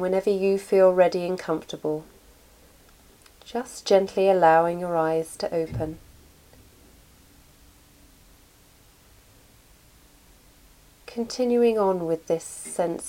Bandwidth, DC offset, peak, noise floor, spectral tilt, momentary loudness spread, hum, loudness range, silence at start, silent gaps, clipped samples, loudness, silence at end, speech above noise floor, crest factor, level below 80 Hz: 16.5 kHz; under 0.1%; -6 dBFS; -55 dBFS; -5.5 dB/octave; 15 LU; none; 12 LU; 0 s; none; under 0.1%; -24 LUFS; 0 s; 32 dB; 20 dB; -56 dBFS